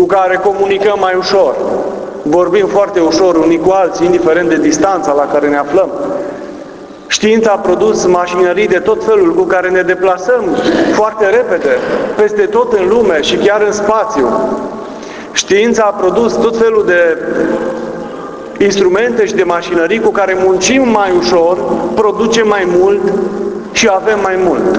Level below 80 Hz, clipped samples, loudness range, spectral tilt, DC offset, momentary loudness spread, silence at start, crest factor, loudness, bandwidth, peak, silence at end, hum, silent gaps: -44 dBFS; under 0.1%; 2 LU; -4 dB/octave; under 0.1%; 8 LU; 0 s; 10 dB; -11 LUFS; 8 kHz; 0 dBFS; 0 s; none; none